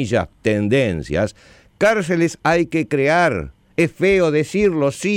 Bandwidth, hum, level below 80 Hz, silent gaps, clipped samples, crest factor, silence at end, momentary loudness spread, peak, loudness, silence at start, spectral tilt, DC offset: 15.5 kHz; none; -44 dBFS; none; under 0.1%; 12 dB; 0 s; 6 LU; -6 dBFS; -18 LUFS; 0 s; -6 dB/octave; under 0.1%